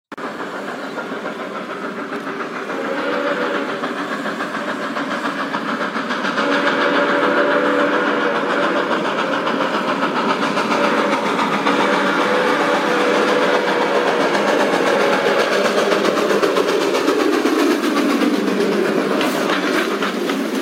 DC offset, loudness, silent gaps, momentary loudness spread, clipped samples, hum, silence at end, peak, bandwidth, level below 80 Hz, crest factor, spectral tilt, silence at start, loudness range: under 0.1%; -18 LUFS; none; 10 LU; under 0.1%; none; 0 s; -2 dBFS; 16 kHz; -76 dBFS; 16 dB; -4 dB/octave; 0.1 s; 6 LU